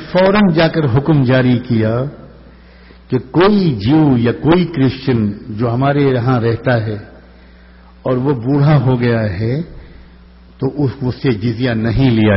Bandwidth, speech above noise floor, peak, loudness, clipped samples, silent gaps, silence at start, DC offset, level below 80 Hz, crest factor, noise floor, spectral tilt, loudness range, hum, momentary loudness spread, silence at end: 5.8 kHz; 28 dB; 0 dBFS; -14 LUFS; under 0.1%; none; 0 s; under 0.1%; -38 dBFS; 14 dB; -41 dBFS; -6.5 dB/octave; 3 LU; none; 9 LU; 0 s